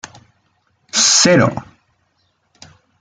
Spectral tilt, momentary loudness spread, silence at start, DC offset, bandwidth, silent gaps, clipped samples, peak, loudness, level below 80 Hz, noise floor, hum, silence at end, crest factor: -2.5 dB/octave; 12 LU; 0.95 s; under 0.1%; 10.5 kHz; none; under 0.1%; 0 dBFS; -12 LUFS; -54 dBFS; -64 dBFS; none; 1.4 s; 18 dB